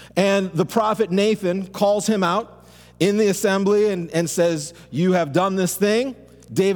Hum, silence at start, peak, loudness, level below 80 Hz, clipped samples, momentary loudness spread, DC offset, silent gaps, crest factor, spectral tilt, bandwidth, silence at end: 60 Hz at -45 dBFS; 0 s; -4 dBFS; -20 LUFS; -56 dBFS; under 0.1%; 6 LU; under 0.1%; none; 16 dB; -5 dB/octave; 19 kHz; 0 s